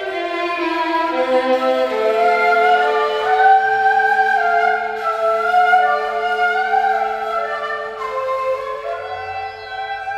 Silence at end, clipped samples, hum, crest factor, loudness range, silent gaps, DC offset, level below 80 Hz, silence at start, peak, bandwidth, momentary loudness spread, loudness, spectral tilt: 0 s; under 0.1%; none; 16 dB; 6 LU; none; under 0.1%; -58 dBFS; 0 s; -2 dBFS; 12.5 kHz; 12 LU; -17 LUFS; -3.5 dB/octave